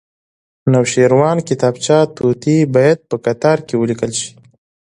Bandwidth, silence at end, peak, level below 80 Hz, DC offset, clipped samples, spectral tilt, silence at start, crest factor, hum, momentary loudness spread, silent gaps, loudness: 11.5 kHz; 0.6 s; 0 dBFS; -54 dBFS; under 0.1%; under 0.1%; -6 dB/octave; 0.65 s; 14 dB; none; 8 LU; none; -14 LUFS